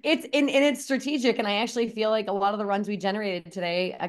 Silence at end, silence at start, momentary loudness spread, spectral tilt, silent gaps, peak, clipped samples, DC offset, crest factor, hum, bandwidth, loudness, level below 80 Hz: 0 s; 0.05 s; 6 LU; -4 dB/octave; none; -10 dBFS; under 0.1%; under 0.1%; 16 dB; none; 12.5 kHz; -26 LUFS; -74 dBFS